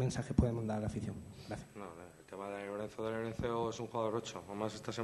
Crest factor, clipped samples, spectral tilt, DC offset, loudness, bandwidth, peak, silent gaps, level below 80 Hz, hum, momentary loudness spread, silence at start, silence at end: 24 dB; under 0.1%; -6.5 dB/octave; under 0.1%; -39 LUFS; 12 kHz; -14 dBFS; none; -54 dBFS; none; 15 LU; 0 s; 0 s